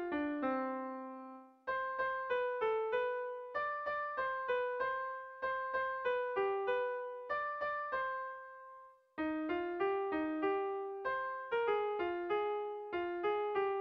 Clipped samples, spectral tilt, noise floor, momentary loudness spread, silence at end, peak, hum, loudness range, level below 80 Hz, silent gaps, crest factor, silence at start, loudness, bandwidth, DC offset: under 0.1%; -6.5 dB/octave; -58 dBFS; 8 LU; 0 s; -24 dBFS; none; 2 LU; -74 dBFS; none; 14 dB; 0 s; -38 LUFS; 5.8 kHz; under 0.1%